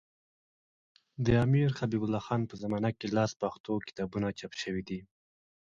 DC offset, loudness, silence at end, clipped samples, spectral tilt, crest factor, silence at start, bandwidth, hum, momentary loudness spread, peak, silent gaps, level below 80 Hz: under 0.1%; -32 LUFS; 0.7 s; under 0.1%; -7 dB/octave; 20 dB; 1.2 s; 7.6 kHz; none; 10 LU; -14 dBFS; 3.36-3.40 s, 3.60-3.64 s; -54 dBFS